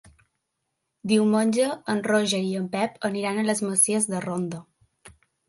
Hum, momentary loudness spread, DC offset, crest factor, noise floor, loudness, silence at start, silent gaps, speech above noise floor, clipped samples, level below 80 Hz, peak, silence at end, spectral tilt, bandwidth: none; 10 LU; under 0.1%; 18 dB; -79 dBFS; -24 LUFS; 1.05 s; none; 55 dB; under 0.1%; -68 dBFS; -8 dBFS; 0.4 s; -4 dB/octave; 12 kHz